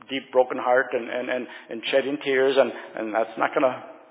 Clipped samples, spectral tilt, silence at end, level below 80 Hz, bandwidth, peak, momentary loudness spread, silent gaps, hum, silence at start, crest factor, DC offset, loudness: under 0.1%; -8 dB/octave; 0.15 s; -86 dBFS; 4 kHz; -6 dBFS; 10 LU; none; none; 0.1 s; 18 dB; under 0.1%; -24 LUFS